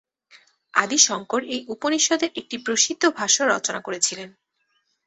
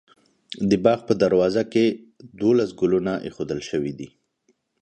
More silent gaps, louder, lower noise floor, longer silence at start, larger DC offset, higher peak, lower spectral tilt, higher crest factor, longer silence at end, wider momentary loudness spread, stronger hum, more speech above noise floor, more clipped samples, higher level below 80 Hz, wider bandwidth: neither; about the same, -21 LUFS vs -22 LUFS; about the same, -71 dBFS vs -68 dBFS; first, 0.75 s vs 0.5 s; neither; about the same, -2 dBFS vs -2 dBFS; second, -0.5 dB/octave vs -6.5 dB/octave; about the same, 22 dB vs 20 dB; about the same, 0.8 s vs 0.75 s; second, 10 LU vs 14 LU; neither; about the same, 48 dB vs 46 dB; neither; second, -70 dBFS vs -56 dBFS; about the same, 8.4 kHz vs 9.2 kHz